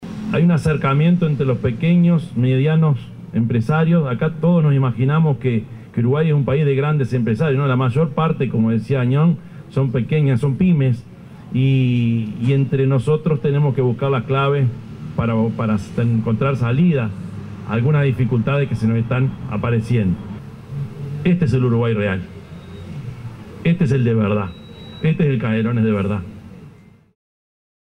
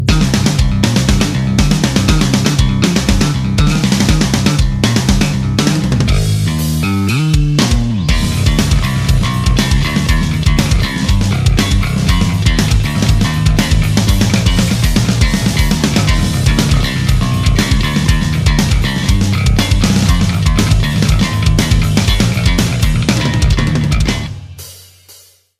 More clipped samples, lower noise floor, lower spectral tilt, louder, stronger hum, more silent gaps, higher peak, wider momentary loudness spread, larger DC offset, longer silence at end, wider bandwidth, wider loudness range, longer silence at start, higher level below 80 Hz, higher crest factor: neither; about the same, -45 dBFS vs -43 dBFS; first, -9 dB/octave vs -5 dB/octave; second, -18 LUFS vs -13 LUFS; neither; neither; second, -6 dBFS vs 0 dBFS; first, 12 LU vs 2 LU; neither; first, 1.15 s vs 0.5 s; second, 10 kHz vs 15.5 kHz; first, 4 LU vs 1 LU; about the same, 0 s vs 0 s; second, -46 dBFS vs -18 dBFS; about the same, 12 dB vs 12 dB